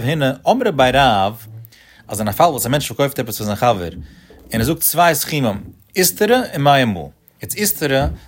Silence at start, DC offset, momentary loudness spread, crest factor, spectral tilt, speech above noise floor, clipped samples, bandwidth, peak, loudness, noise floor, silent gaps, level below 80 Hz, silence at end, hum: 0 s; under 0.1%; 14 LU; 16 dB; -4 dB/octave; 25 dB; under 0.1%; 16.5 kHz; 0 dBFS; -16 LUFS; -41 dBFS; none; -38 dBFS; 0.1 s; none